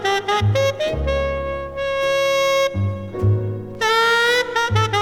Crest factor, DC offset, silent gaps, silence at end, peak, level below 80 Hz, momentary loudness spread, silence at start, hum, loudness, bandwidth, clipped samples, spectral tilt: 14 dB; under 0.1%; none; 0 s; -6 dBFS; -34 dBFS; 9 LU; 0 s; none; -19 LUFS; 18 kHz; under 0.1%; -4.5 dB/octave